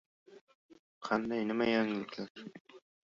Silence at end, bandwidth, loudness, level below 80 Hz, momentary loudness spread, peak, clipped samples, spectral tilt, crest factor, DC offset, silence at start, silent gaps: 0.3 s; 7.4 kHz; -34 LUFS; -72 dBFS; 20 LU; -16 dBFS; under 0.1%; -3.5 dB/octave; 20 dB; under 0.1%; 0.3 s; 0.41-0.47 s, 0.55-0.69 s, 0.79-1.01 s, 2.30-2.35 s, 2.60-2.65 s